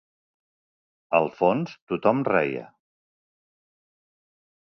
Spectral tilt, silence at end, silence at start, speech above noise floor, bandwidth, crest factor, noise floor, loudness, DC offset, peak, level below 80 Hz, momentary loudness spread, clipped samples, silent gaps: -8 dB/octave; 2.1 s; 1.1 s; over 67 dB; 6.4 kHz; 24 dB; under -90 dBFS; -24 LUFS; under 0.1%; -4 dBFS; -68 dBFS; 8 LU; under 0.1%; 1.82-1.87 s